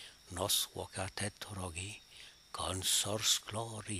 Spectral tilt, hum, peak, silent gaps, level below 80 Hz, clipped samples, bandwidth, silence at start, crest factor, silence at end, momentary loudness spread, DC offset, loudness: -2 dB/octave; none; -16 dBFS; none; -62 dBFS; under 0.1%; 15.5 kHz; 0 s; 22 dB; 0 s; 16 LU; under 0.1%; -35 LUFS